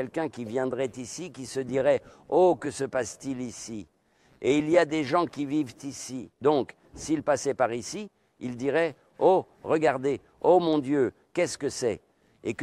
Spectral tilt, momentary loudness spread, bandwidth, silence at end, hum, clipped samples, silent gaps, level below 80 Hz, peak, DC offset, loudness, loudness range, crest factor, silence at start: -5 dB/octave; 15 LU; 13 kHz; 0 s; none; under 0.1%; none; -64 dBFS; -8 dBFS; under 0.1%; -27 LUFS; 3 LU; 18 dB; 0 s